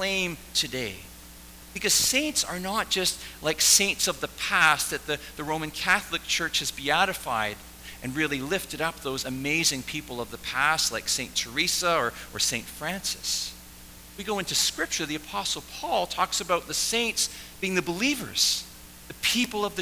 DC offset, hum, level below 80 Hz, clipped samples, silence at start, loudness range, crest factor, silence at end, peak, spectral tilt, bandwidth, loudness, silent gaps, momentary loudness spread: under 0.1%; none; -52 dBFS; under 0.1%; 0 s; 5 LU; 24 dB; 0 s; -4 dBFS; -1.5 dB/octave; 16 kHz; -25 LUFS; none; 13 LU